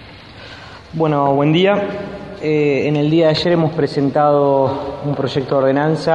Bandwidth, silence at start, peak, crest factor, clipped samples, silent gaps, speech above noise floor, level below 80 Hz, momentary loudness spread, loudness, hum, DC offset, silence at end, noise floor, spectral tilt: 9.2 kHz; 0 s; -2 dBFS; 14 dB; under 0.1%; none; 22 dB; -48 dBFS; 16 LU; -16 LUFS; none; 0.1%; 0 s; -37 dBFS; -7.5 dB/octave